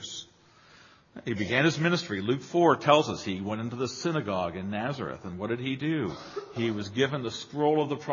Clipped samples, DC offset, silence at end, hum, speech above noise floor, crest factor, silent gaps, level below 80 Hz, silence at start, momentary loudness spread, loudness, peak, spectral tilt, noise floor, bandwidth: under 0.1%; under 0.1%; 0 s; none; 30 dB; 24 dB; none; -64 dBFS; 0 s; 12 LU; -28 LUFS; -6 dBFS; -5.5 dB/octave; -58 dBFS; 7.4 kHz